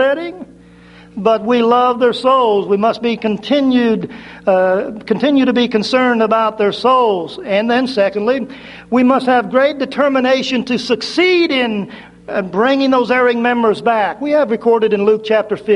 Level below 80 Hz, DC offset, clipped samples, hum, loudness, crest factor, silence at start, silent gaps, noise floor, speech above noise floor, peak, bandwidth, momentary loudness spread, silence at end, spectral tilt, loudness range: -56 dBFS; under 0.1%; under 0.1%; none; -14 LUFS; 14 dB; 0 s; none; -41 dBFS; 27 dB; 0 dBFS; 11 kHz; 8 LU; 0 s; -5.5 dB/octave; 1 LU